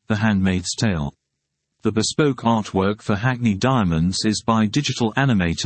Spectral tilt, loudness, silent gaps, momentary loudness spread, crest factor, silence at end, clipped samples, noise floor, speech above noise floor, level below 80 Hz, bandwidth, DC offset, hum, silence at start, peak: -5.5 dB/octave; -20 LUFS; none; 3 LU; 16 dB; 0 s; under 0.1%; -77 dBFS; 58 dB; -46 dBFS; 8.8 kHz; under 0.1%; none; 0.1 s; -4 dBFS